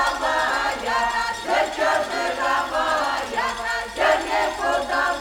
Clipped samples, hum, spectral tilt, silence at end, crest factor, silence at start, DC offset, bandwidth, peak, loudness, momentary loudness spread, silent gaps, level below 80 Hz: under 0.1%; none; -2 dB/octave; 0 s; 16 dB; 0 s; under 0.1%; 19 kHz; -6 dBFS; -22 LUFS; 4 LU; none; -48 dBFS